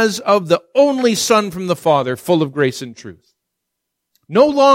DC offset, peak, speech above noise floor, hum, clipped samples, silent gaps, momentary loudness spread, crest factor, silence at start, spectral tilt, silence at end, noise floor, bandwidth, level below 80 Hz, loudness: under 0.1%; 0 dBFS; 62 dB; none; under 0.1%; none; 7 LU; 14 dB; 0 s; -4.5 dB/octave; 0 s; -77 dBFS; 16.5 kHz; -60 dBFS; -15 LUFS